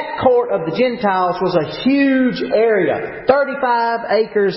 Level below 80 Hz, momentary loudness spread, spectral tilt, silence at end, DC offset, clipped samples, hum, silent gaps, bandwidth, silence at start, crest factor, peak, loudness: -52 dBFS; 4 LU; -10.5 dB/octave; 0 s; under 0.1%; under 0.1%; none; none; 5.8 kHz; 0 s; 16 dB; 0 dBFS; -16 LUFS